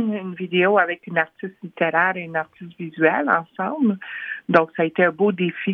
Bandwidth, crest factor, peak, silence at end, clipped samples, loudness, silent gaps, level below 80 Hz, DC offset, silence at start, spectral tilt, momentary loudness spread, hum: 5.8 kHz; 20 dB; -2 dBFS; 0 s; under 0.1%; -21 LUFS; none; -72 dBFS; under 0.1%; 0 s; -8.5 dB/octave; 12 LU; none